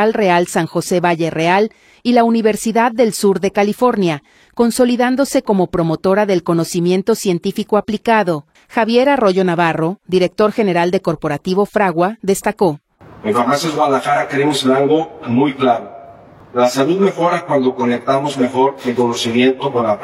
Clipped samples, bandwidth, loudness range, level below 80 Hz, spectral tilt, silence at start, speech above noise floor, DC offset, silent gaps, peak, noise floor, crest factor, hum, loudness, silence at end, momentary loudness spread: under 0.1%; 16 kHz; 2 LU; -52 dBFS; -5.5 dB/octave; 0 s; 25 dB; under 0.1%; none; 0 dBFS; -40 dBFS; 14 dB; none; -15 LUFS; 0 s; 5 LU